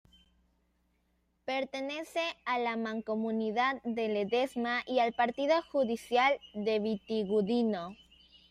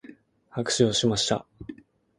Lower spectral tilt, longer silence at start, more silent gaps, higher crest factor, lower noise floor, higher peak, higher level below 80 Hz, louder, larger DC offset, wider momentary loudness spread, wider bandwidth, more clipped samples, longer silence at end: first, -5.5 dB/octave vs -4 dB/octave; first, 1.45 s vs 0.1 s; neither; about the same, 18 dB vs 20 dB; first, -75 dBFS vs -51 dBFS; second, -14 dBFS vs -8 dBFS; second, -70 dBFS vs -56 dBFS; second, -32 LUFS vs -24 LUFS; neither; second, 7 LU vs 22 LU; first, 14 kHz vs 11.5 kHz; neither; about the same, 0.55 s vs 0.45 s